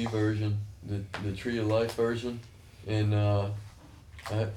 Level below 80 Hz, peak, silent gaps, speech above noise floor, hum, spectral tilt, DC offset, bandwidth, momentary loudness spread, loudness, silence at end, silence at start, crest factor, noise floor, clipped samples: -54 dBFS; -16 dBFS; none; 21 dB; none; -7 dB/octave; under 0.1%; 12 kHz; 16 LU; -31 LUFS; 0 s; 0 s; 14 dB; -50 dBFS; under 0.1%